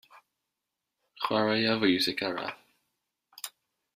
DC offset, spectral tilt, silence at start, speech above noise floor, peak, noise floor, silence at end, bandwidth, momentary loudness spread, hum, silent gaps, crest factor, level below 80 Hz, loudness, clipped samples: under 0.1%; -4 dB/octave; 0.15 s; 58 dB; -10 dBFS; -86 dBFS; 0.5 s; 15.5 kHz; 17 LU; none; none; 22 dB; -72 dBFS; -28 LUFS; under 0.1%